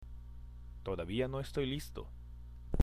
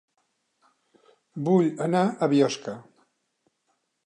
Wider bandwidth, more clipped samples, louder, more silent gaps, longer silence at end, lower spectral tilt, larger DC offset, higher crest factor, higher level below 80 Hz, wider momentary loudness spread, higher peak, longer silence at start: first, 15 kHz vs 10.5 kHz; neither; second, -39 LUFS vs -24 LUFS; neither; second, 0 s vs 1.25 s; about the same, -6.5 dB/octave vs -6.5 dB/octave; neither; about the same, 22 dB vs 20 dB; first, -48 dBFS vs -78 dBFS; about the same, 16 LU vs 17 LU; second, -16 dBFS vs -8 dBFS; second, 0 s vs 1.35 s